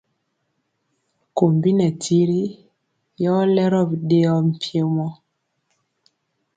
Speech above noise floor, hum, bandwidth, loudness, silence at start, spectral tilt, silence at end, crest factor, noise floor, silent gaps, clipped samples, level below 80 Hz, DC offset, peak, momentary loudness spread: 54 dB; none; 9.2 kHz; -19 LUFS; 1.35 s; -7.5 dB/octave; 1.45 s; 18 dB; -72 dBFS; none; under 0.1%; -64 dBFS; under 0.1%; -2 dBFS; 8 LU